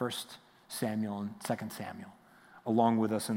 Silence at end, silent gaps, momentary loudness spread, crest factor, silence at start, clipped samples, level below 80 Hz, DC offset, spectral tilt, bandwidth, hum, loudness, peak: 0 s; none; 20 LU; 20 dB; 0 s; under 0.1%; -80 dBFS; under 0.1%; -5.5 dB/octave; 16.5 kHz; none; -34 LUFS; -14 dBFS